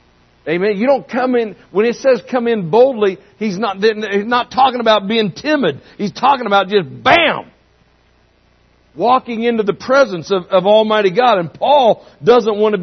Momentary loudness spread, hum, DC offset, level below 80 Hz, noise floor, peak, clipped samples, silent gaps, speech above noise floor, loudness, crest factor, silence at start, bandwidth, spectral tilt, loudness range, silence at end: 8 LU; none; under 0.1%; -56 dBFS; -54 dBFS; 0 dBFS; under 0.1%; none; 40 dB; -14 LUFS; 14 dB; 0.45 s; 6.4 kHz; -5.5 dB/octave; 3 LU; 0 s